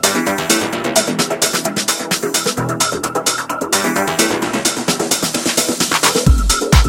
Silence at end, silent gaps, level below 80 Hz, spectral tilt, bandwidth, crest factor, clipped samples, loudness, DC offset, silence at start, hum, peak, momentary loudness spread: 0 s; none; -24 dBFS; -3 dB/octave; 17 kHz; 16 dB; under 0.1%; -15 LUFS; under 0.1%; 0 s; none; 0 dBFS; 4 LU